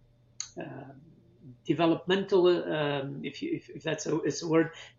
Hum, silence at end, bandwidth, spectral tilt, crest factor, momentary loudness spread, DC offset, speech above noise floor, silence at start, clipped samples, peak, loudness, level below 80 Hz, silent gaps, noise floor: none; 0.1 s; 7.6 kHz; -5 dB/octave; 20 dB; 18 LU; under 0.1%; 27 dB; 0.4 s; under 0.1%; -12 dBFS; -29 LUFS; -70 dBFS; none; -56 dBFS